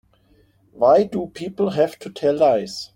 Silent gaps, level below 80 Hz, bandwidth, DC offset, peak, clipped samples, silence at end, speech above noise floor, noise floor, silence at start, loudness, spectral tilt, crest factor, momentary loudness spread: none; -58 dBFS; 16.5 kHz; under 0.1%; -4 dBFS; under 0.1%; 0.1 s; 38 dB; -57 dBFS; 0.8 s; -20 LUFS; -6 dB/octave; 16 dB; 9 LU